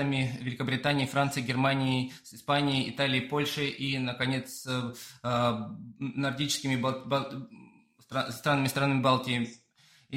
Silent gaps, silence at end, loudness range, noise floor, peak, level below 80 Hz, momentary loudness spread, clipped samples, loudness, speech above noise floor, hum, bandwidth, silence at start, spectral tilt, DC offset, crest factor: none; 0 s; 3 LU; -63 dBFS; -12 dBFS; -66 dBFS; 11 LU; under 0.1%; -30 LUFS; 33 dB; none; 16 kHz; 0 s; -5 dB/octave; under 0.1%; 18 dB